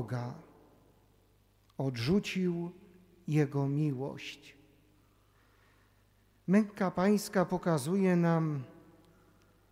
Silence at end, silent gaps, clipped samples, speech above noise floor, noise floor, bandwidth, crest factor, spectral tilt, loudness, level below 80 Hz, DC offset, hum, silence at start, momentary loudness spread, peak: 1 s; none; under 0.1%; 36 dB; -67 dBFS; 16 kHz; 18 dB; -7 dB/octave; -32 LUFS; -66 dBFS; under 0.1%; none; 0 s; 17 LU; -16 dBFS